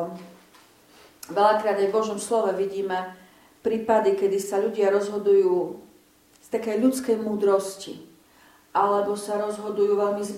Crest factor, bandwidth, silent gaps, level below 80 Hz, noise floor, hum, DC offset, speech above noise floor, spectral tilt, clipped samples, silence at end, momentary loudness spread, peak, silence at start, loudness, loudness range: 18 dB; 15.5 kHz; none; -70 dBFS; -57 dBFS; none; under 0.1%; 34 dB; -5 dB/octave; under 0.1%; 0 s; 14 LU; -8 dBFS; 0 s; -24 LUFS; 2 LU